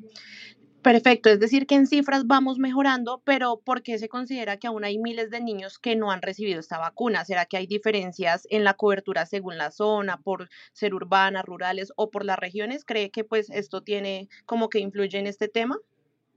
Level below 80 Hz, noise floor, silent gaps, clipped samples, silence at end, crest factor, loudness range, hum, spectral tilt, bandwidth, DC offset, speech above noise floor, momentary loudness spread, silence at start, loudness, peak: -88 dBFS; -48 dBFS; none; under 0.1%; 0.55 s; 22 dB; 8 LU; none; -5 dB/octave; 7.6 kHz; under 0.1%; 23 dB; 12 LU; 0.05 s; -25 LUFS; -2 dBFS